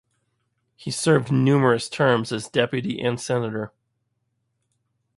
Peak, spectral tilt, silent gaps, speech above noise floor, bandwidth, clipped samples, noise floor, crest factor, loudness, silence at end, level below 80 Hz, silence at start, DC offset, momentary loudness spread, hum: -4 dBFS; -5.5 dB/octave; none; 53 dB; 11.5 kHz; under 0.1%; -74 dBFS; 20 dB; -22 LUFS; 1.5 s; -62 dBFS; 0.8 s; under 0.1%; 12 LU; none